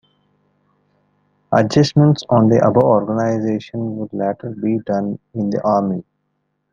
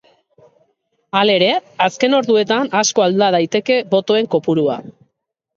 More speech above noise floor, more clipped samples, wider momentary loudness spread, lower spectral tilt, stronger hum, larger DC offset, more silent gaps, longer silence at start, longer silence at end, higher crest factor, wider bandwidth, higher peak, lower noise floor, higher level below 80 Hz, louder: about the same, 54 dB vs 57 dB; neither; first, 11 LU vs 4 LU; first, -7.5 dB/octave vs -4 dB/octave; first, 50 Hz at -35 dBFS vs none; neither; neither; first, 1.5 s vs 1.15 s; about the same, 0.7 s vs 0.65 s; about the same, 16 dB vs 16 dB; about the same, 7.4 kHz vs 7.8 kHz; about the same, -2 dBFS vs 0 dBFS; about the same, -70 dBFS vs -72 dBFS; first, -56 dBFS vs -66 dBFS; about the same, -17 LUFS vs -15 LUFS